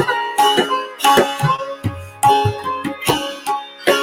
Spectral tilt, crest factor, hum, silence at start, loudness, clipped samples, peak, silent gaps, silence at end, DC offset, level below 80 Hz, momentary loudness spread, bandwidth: -4 dB/octave; 16 dB; none; 0 s; -17 LUFS; under 0.1%; 0 dBFS; none; 0 s; under 0.1%; -50 dBFS; 10 LU; 17 kHz